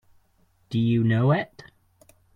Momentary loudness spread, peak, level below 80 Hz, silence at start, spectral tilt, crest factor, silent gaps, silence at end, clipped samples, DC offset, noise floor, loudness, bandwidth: 10 LU; -8 dBFS; -60 dBFS; 0.7 s; -9 dB/octave; 18 dB; none; 0.9 s; under 0.1%; under 0.1%; -64 dBFS; -23 LUFS; 6.2 kHz